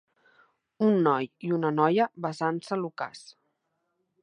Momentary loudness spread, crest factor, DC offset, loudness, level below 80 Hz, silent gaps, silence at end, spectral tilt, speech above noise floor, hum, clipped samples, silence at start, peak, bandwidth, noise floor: 12 LU; 20 dB; under 0.1%; -27 LUFS; -80 dBFS; none; 0.9 s; -7 dB/octave; 51 dB; none; under 0.1%; 0.8 s; -8 dBFS; 10.5 kHz; -78 dBFS